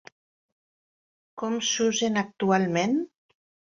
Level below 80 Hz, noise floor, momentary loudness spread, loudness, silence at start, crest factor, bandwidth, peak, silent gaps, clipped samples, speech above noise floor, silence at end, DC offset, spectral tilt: -70 dBFS; under -90 dBFS; 8 LU; -25 LUFS; 1.35 s; 18 dB; 7.8 kHz; -10 dBFS; none; under 0.1%; over 65 dB; 0.7 s; under 0.1%; -4 dB/octave